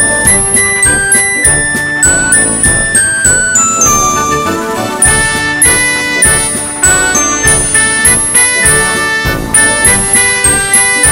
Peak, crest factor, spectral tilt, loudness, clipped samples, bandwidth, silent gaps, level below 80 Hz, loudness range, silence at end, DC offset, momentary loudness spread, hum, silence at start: 0 dBFS; 8 dB; -1.5 dB/octave; -6 LUFS; 0.5%; over 20 kHz; none; -26 dBFS; 1 LU; 0 s; 0.4%; 5 LU; none; 0 s